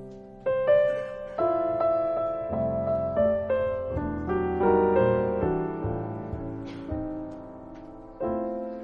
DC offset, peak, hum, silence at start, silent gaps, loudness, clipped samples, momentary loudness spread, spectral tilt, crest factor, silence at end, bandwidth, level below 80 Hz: under 0.1%; -10 dBFS; none; 0 s; none; -27 LUFS; under 0.1%; 15 LU; -10 dB/octave; 18 dB; 0 s; 5.4 kHz; -46 dBFS